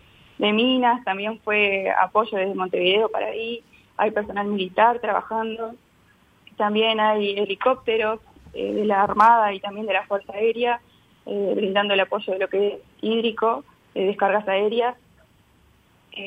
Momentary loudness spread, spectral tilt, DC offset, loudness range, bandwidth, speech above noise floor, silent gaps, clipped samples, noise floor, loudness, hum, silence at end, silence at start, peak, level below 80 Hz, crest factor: 11 LU; -6 dB/octave; under 0.1%; 3 LU; 8 kHz; 36 dB; none; under 0.1%; -58 dBFS; -22 LUFS; none; 0 s; 0.4 s; -4 dBFS; -62 dBFS; 18 dB